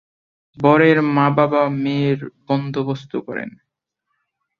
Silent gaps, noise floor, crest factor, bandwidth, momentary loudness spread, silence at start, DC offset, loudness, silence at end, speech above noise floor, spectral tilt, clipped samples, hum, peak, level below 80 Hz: none; -76 dBFS; 18 dB; 6.8 kHz; 14 LU; 0.6 s; under 0.1%; -18 LUFS; 1.1 s; 58 dB; -8.5 dB/octave; under 0.1%; none; -2 dBFS; -62 dBFS